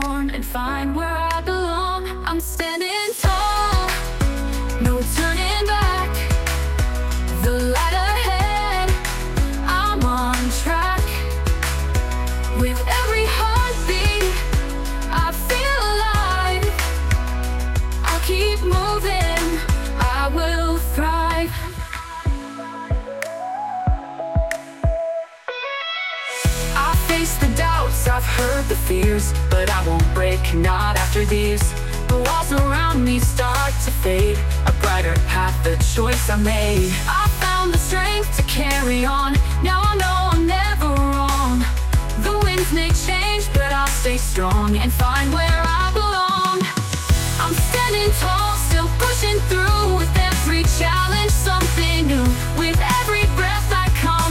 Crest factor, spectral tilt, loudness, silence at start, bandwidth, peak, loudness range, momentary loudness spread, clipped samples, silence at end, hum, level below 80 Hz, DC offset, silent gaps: 14 dB; -4.5 dB/octave; -20 LUFS; 0 s; 17 kHz; -4 dBFS; 4 LU; 6 LU; under 0.1%; 0 s; none; -22 dBFS; under 0.1%; none